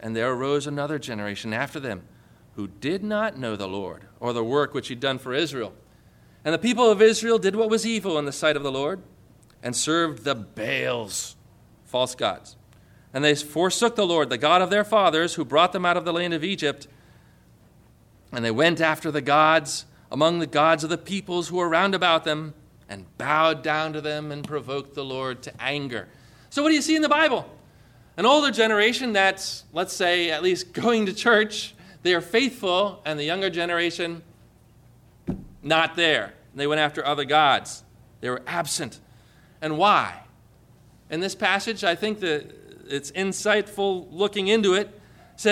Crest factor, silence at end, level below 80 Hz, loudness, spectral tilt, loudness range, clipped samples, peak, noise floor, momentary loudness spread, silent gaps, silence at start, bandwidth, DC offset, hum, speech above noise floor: 18 dB; 0 s; -60 dBFS; -23 LUFS; -3.5 dB/octave; 6 LU; under 0.1%; -6 dBFS; -55 dBFS; 14 LU; none; 0 s; 16 kHz; under 0.1%; none; 32 dB